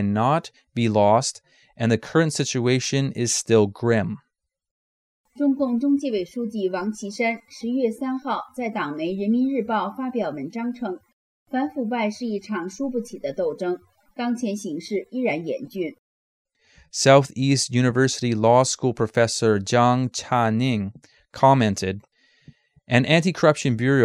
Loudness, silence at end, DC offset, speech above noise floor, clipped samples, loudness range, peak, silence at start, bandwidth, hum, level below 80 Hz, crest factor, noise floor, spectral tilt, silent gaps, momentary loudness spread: -22 LUFS; 0 s; under 0.1%; 31 dB; under 0.1%; 8 LU; -2 dBFS; 0 s; 13.5 kHz; none; -62 dBFS; 20 dB; -53 dBFS; -5 dB/octave; 4.71-5.24 s, 11.13-11.46 s, 15.99-16.45 s; 12 LU